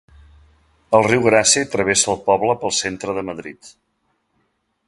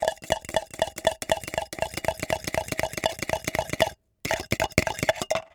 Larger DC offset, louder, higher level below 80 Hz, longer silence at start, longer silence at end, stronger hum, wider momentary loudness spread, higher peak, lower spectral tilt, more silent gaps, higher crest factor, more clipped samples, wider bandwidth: neither; first, -17 LUFS vs -28 LUFS; second, -52 dBFS vs -46 dBFS; first, 0.9 s vs 0 s; first, 1.2 s vs 0.05 s; neither; first, 13 LU vs 5 LU; about the same, 0 dBFS vs -2 dBFS; about the same, -2.5 dB/octave vs -3.5 dB/octave; neither; second, 20 dB vs 26 dB; neither; second, 11.5 kHz vs over 20 kHz